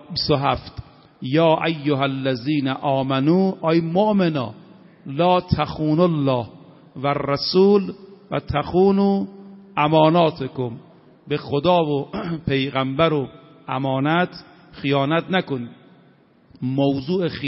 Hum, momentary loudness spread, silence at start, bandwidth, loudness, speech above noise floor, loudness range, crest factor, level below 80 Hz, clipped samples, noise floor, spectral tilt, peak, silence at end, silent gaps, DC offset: none; 14 LU; 0.1 s; 5.8 kHz; -20 LUFS; 34 dB; 3 LU; 18 dB; -48 dBFS; under 0.1%; -54 dBFS; -5.5 dB/octave; -4 dBFS; 0 s; none; under 0.1%